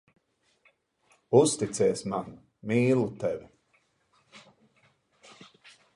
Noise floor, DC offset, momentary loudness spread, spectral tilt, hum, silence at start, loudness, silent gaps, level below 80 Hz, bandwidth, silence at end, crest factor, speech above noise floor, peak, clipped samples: -70 dBFS; under 0.1%; 15 LU; -5.5 dB/octave; none; 1.3 s; -27 LUFS; none; -66 dBFS; 11.5 kHz; 1.55 s; 24 dB; 44 dB; -6 dBFS; under 0.1%